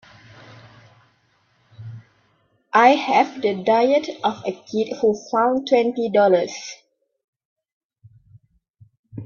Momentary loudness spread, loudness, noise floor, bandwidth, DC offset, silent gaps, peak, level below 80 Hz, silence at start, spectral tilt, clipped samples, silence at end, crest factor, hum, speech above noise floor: 22 LU; -19 LUFS; -64 dBFS; 7.2 kHz; under 0.1%; 7.24-7.33 s, 7.45-7.56 s, 7.73-7.90 s, 8.70-8.74 s, 8.99-9.04 s; 0 dBFS; -68 dBFS; 1.8 s; -5 dB/octave; under 0.1%; 0 s; 22 dB; none; 45 dB